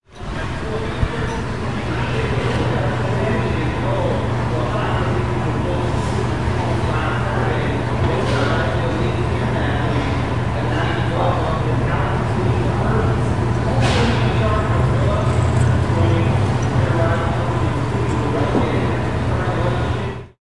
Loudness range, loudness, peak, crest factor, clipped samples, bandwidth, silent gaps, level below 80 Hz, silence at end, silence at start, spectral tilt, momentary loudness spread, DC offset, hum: 3 LU; -19 LUFS; -4 dBFS; 14 dB; under 0.1%; 11 kHz; none; -30 dBFS; 0 s; 0 s; -7 dB/octave; 5 LU; 2%; none